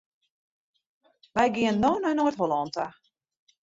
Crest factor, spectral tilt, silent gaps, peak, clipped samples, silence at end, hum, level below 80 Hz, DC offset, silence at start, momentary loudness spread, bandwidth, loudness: 20 dB; -5.5 dB/octave; none; -8 dBFS; under 0.1%; 0.75 s; none; -60 dBFS; under 0.1%; 1.35 s; 9 LU; 7.8 kHz; -26 LUFS